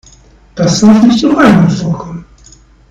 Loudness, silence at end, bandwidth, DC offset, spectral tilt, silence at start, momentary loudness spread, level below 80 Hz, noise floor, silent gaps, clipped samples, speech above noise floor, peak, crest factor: -8 LUFS; 0.65 s; 9.4 kHz; under 0.1%; -6 dB/octave; 0.55 s; 20 LU; -38 dBFS; -41 dBFS; none; 3%; 34 dB; 0 dBFS; 10 dB